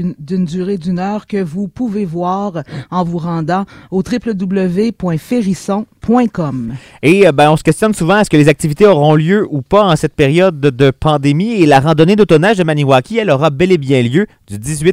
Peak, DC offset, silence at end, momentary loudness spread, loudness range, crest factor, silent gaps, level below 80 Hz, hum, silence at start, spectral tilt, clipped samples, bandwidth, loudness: 0 dBFS; under 0.1%; 0 s; 10 LU; 7 LU; 12 dB; none; -40 dBFS; none; 0 s; -6.5 dB/octave; 0.3%; 15.5 kHz; -12 LUFS